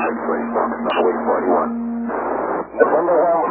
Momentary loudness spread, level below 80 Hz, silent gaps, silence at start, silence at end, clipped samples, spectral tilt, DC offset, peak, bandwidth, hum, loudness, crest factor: 7 LU; -52 dBFS; none; 0 s; 0 s; under 0.1%; -10 dB/octave; under 0.1%; 0 dBFS; 4.2 kHz; none; -19 LUFS; 18 dB